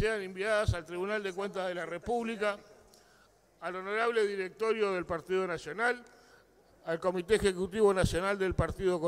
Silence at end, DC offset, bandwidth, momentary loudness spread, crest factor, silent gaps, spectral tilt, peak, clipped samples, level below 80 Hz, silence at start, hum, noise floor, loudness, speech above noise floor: 0 s; under 0.1%; 15 kHz; 9 LU; 18 dB; none; -5.5 dB/octave; -14 dBFS; under 0.1%; -48 dBFS; 0 s; none; -64 dBFS; -32 LUFS; 33 dB